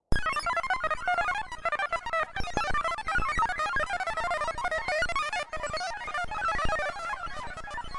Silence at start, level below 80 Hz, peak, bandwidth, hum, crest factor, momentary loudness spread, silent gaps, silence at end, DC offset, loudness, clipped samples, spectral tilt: 0.1 s; -42 dBFS; -10 dBFS; 11.5 kHz; none; 20 dB; 6 LU; none; 0 s; under 0.1%; -30 LUFS; under 0.1%; -3 dB/octave